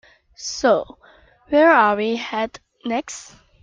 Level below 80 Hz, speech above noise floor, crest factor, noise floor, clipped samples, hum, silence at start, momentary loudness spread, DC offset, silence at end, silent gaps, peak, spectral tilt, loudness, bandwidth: -56 dBFS; 33 dB; 18 dB; -52 dBFS; under 0.1%; none; 0.4 s; 20 LU; under 0.1%; 0.4 s; none; -2 dBFS; -3.5 dB/octave; -19 LUFS; 9.4 kHz